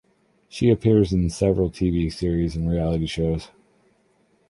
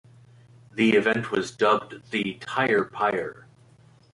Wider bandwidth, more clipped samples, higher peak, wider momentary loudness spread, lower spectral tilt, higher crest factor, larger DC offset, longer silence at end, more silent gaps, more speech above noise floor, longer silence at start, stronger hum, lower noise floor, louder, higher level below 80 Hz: about the same, 11.5 kHz vs 11.5 kHz; neither; about the same, -6 dBFS vs -8 dBFS; second, 7 LU vs 10 LU; first, -7.5 dB/octave vs -5 dB/octave; about the same, 18 dB vs 18 dB; neither; first, 1.05 s vs 0.75 s; neither; first, 42 dB vs 31 dB; second, 0.55 s vs 0.75 s; neither; first, -63 dBFS vs -55 dBFS; about the same, -22 LUFS vs -24 LUFS; first, -36 dBFS vs -66 dBFS